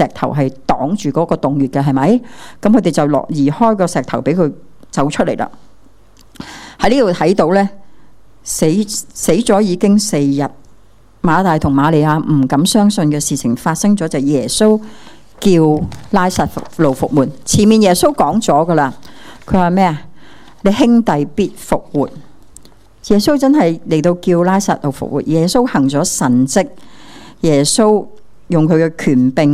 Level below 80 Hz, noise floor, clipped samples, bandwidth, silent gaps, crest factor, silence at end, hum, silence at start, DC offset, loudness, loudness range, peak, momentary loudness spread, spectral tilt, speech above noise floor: -40 dBFS; -47 dBFS; 0.2%; 15.5 kHz; none; 14 dB; 0 s; none; 0 s; under 0.1%; -14 LUFS; 3 LU; 0 dBFS; 8 LU; -5.5 dB/octave; 34 dB